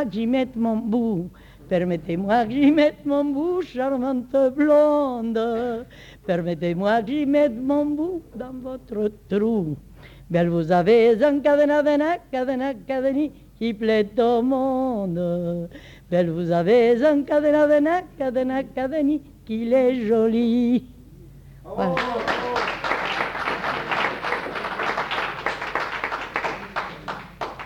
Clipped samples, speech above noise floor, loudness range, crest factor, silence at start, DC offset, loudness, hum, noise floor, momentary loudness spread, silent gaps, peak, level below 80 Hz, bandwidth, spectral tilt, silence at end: under 0.1%; 24 dB; 5 LU; 14 dB; 0 s; under 0.1%; -22 LUFS; none; -45 dBFS; 12 LU; none; -8 dBFS; -52 dBFS; 14 kHz; -7 dB/octave; 0 s